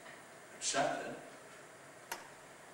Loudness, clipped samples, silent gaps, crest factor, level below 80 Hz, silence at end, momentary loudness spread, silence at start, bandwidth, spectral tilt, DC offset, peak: -39 LUFS; under 0.1%; none; 22 dB; -84 dBFS; 0 s; 20 LU; 0 s; 16 kHz; -1.5 dB/octave; under 0.1%; -20 dBFS